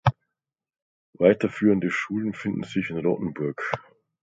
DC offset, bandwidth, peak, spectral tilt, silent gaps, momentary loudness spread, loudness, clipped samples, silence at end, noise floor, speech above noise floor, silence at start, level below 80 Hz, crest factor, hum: under 0.1%; 7.8 kHz; -2 dBFS; -7.5 dB/octave; 0.82-1.13 s; 10 LU; -25 LUFS; under 0.1%; 0.4 s; -87 dBFS; 63 dB; 0.05 s; -56 dBFS; 22 dB; none